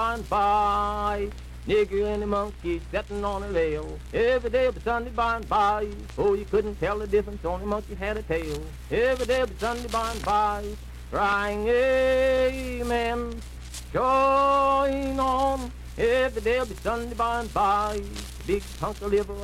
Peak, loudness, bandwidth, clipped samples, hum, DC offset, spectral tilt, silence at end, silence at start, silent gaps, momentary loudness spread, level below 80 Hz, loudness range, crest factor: -12 dBFS; -26 LUFS; 15.5 kHz; under 0.1%; none; under 0.1%; -5.5 dB/octave; 0 s; 0 s; none; 11 LU; -38 dBFS; 4 LU; 14 dB